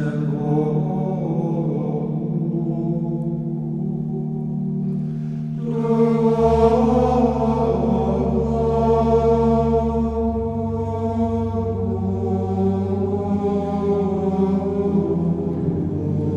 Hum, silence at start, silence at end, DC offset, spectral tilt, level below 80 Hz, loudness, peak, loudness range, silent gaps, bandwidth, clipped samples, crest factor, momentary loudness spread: none; 0 s; 0 s; under 0.1%; -10 dB/octave; -34 dBFS; -21 LUFS; -2 dBFS; 6 LU; none; 7.6 kHz; under 0.1%; 18 dB; 8 LU